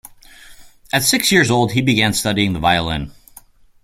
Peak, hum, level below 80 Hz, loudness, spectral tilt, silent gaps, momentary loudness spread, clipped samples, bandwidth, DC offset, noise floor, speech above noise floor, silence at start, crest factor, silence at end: 0 dBFS; none; -42 dBFS; -16 LUFS; -3.5 dB/octave; none; 10 LU; under 0.1%; 16.5 kHz; under 0.1%; -46 dBFS; 30 dB; 0.5 s; 18 dB; 0.7 s